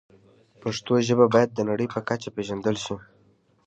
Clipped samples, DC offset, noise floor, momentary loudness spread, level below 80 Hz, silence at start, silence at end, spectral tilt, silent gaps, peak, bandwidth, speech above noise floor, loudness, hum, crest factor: under 0.1%; under 0.1%; -62 dBFS; 13 LU; -60 dBFS; 0.65 s; 0.65 s; -6 dB/octave; none; -4 dBFS; 8.4 kHz; 38 dB; -24 LUFS; none; 22 dB